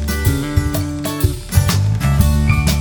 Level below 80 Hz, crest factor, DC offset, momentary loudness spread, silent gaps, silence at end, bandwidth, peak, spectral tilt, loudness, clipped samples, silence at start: -20 dBFS; 16 dB; under 0.1%; 6 LU; none; 0 s; over 20 kHz; 0 dBFS; -5.5 dB/octave; -17 LUFS; under 0.1%; 0 s